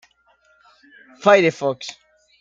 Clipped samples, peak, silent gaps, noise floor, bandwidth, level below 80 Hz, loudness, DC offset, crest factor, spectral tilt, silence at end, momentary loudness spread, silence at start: under 0.1%; -2 dBFS; none; -59 dBFS; 7.8 kHz; -68 dBFS; -18 LUFS; under 0.1%; 20 dB; -5 dB/octave; 0.5 s; 17 LU; 1.25 s